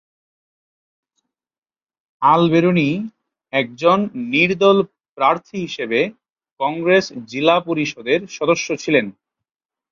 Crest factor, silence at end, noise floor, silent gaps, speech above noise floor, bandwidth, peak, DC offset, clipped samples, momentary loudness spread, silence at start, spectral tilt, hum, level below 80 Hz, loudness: 18 dB; 0.8 s; under -90 dBFS; 5.09-5.16 s, 6.52-6.56 s; over 73 dB; 7.4 kHz; -2 dBFS; under 0.1%; under 0.1%; 10 LU; 2.2 s; -5.5 dB/octave; none; -62 dBFS; -18 LUFS